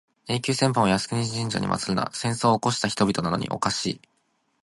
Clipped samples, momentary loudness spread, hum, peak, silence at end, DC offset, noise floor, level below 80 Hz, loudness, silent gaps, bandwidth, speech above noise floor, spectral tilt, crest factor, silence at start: under 0.1%; 6 LU; none; -6 dBFS; 0.65 s; under 0.1%; -70 dBFS; -54 dBFS; -24 LUFS; none; 11.5 kHz; 46 dB; -4.5 dB/octave; 20 dB; 0.25 s